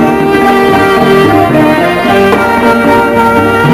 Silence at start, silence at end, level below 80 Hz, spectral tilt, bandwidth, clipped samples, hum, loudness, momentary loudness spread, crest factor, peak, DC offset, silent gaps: 0 s; 0 s; -32 dBFS; -6 dB/octave; 16 kHz; 3%; none; -7 LUFS; 2 LU; 6 dB; 0 dBFS; under 0.1%; none